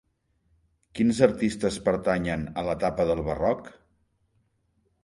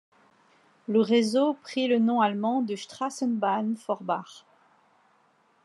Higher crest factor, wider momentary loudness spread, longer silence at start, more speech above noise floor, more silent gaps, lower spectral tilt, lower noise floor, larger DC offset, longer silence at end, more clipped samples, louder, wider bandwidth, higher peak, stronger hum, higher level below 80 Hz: first, 24 dB vs 18 dB; about the same, 8 LU vs 10 LU; about the same, 0.95 s vs 0.9 s; first, 46 dB vs 39 dB; neither; about the same, -6 dB/octave vs -5.5 dB/octave; first, -71 dBFS vs -65 dBFS; neither; about the same, 1.3 s vs 1.25 s; neither; about the same, -26 LUFS vs -26 LUFS; about the same, 11.5 kHz vs 11.5 kHz; first, -4 dBFS vs -10 dBFS; neither; first, -48 dBFS vs -88 dBFS